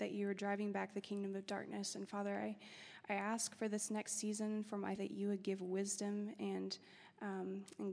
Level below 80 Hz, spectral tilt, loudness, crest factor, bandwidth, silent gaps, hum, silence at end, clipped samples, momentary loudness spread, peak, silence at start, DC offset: under -90 dBFS; -4 dB/octave; -43 LUFS; 18 dB; 11 kHz; none; none; 0 s; under 0.1%; 7 LU; -26 dBFS; 0 s; under 0.1%